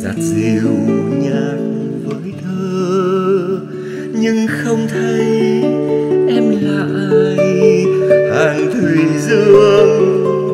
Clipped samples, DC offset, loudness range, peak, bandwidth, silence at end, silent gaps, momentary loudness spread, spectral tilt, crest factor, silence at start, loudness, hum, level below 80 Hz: under 0.1%; under 0.1%; 6 LU; 0 dBFS; 13 kHz; 0 s; none; 11 LU; -6.5 dB/octave; 12 dB; 0 s; -13 LUFS; none; -54 dBFS